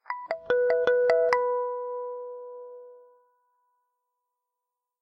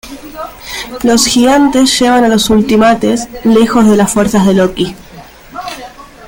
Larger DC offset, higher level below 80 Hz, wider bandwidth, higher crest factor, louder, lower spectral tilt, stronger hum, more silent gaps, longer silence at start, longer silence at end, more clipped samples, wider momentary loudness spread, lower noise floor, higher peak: neither; second, -72 dBFS vs -36 dBFS; second, 6.4 kHz vs 17 kHz; first, 22 dB vs 10 dB; second, -26 LUFS vs -9 LUFS; about the same, -3.5 dB/octave vs -4 dB/octave; neither; neither; about the same, 0.1 s vs 0.05 s; first, 2.05 s vs 0 s; neither; first, 20 LU vs 17 LU; first, -86 dBFS vs -33 dBFS; second, -6 dBFS vs 0 dBFS